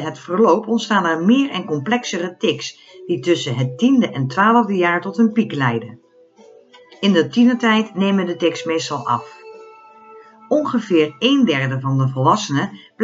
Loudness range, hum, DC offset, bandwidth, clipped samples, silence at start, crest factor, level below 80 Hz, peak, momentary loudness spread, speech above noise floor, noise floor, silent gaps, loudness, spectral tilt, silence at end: 3 LU; none; under 0.1%; 7.8 kHz; under 0.1%; 0 s; 16 dB; -70 dBFS; -2 dBFS; 8 LU; 31 dB; -48 dBFS; none; -18 LUFS; -5.5 dB/octave; 0 s